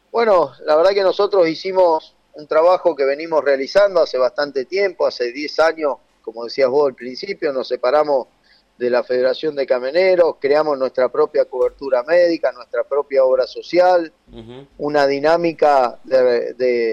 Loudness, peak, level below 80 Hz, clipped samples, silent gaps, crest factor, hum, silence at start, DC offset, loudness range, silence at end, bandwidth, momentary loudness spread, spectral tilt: -17 LUFS; -4 dBFS; -58 dBFS; under 0.1%; none; 12 dB; none; 0.15 s; under 0.1%; 3 LU; 0 s; 7.6 kHz; 8 LU; -5 dB/octave